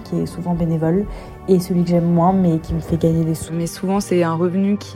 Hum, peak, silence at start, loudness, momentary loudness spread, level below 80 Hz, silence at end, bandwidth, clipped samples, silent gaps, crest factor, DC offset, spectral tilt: none; -2 dBFS; 0 s; -18 LUFS; 8 LU; -38 dBFS; 0 s; 15 kHz; under 0.1%; none; 16 dB; under 0.1%; -7.5 dB/octave